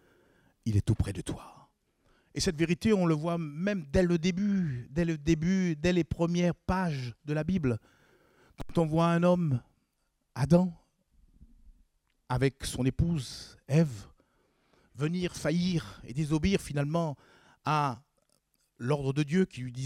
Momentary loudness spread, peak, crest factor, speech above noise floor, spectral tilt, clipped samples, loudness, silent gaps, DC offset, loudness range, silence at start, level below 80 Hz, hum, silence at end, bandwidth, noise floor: 12 LU; -10 dBFS; 20 dB; 48 dB; -6.5 dB/octave; under 0.1%; -30 LUFS; none; under 0.1%; 4 LU; 0.65 s; -48 dBFS; none; 0 s; 13 kHz; -77 dBFS